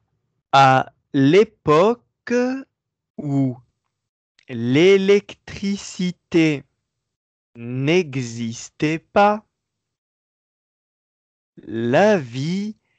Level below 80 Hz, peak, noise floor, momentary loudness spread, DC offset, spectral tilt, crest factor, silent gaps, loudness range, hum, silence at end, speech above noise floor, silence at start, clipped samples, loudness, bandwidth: -60 dBFS; -4 dBFS; -80 dBFS; 15 LU; under 0.1%; -6 dB/octave; 18 dB; 3.10-3.14 s, 4.09-4.35 s, 7.16-7.53 s, 9.98-11.53 s; 6 LU; none; 0.25 s; 61 dB; 0.55 s; under 0.1%; -19 LUFS; 8.6 kHz